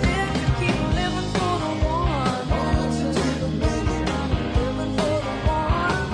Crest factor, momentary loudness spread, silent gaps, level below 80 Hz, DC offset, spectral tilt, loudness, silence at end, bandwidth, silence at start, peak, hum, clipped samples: 14 dB; 2 LU; none; -30 dBFS; under 0.1%; -6 dB/octave; -23 LUFS; 0 s; 10.5 kHz; 0 s; -8 dBFS; none; under 0.1%